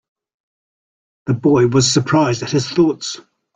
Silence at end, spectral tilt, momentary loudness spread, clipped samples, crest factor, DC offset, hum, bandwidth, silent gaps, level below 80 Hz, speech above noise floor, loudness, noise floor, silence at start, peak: 0.4 s; -5 dB/octave; 13 LU; under 0.1%; 16 dB; under 0.1%; none; 9.6 kHz; none; -50 dBFS; over 75 dB; -16 LUFS; under -90 dBFS; 1.25 s; -2 dBFS